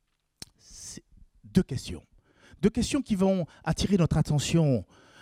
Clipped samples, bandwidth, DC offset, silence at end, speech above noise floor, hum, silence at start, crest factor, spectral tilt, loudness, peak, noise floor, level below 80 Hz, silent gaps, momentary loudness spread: under 0.1%; 15 kHz; under 0.1%; 0.4 s; 31 dB; none; 0.7 s; 20 dB; -6 dB/octave; -27 LUFS; -8 dBFS; -56 dBFS; -46 dBFS; none; 21 LU